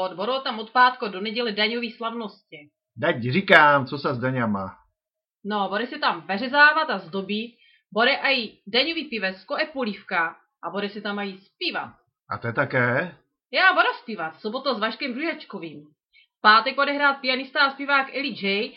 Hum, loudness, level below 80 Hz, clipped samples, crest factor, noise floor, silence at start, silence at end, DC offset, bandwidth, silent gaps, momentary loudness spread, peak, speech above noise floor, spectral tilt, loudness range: none; -22 LUFS; -70 dBFS; under 0.1%; 24 dB; -88 dBFS; 0 s; 0.05 s; under 0.1%; 7.2 kHz; none; 15 LU; 0 dBFS; 65 dB; -6.5 dB/octave; 5 LU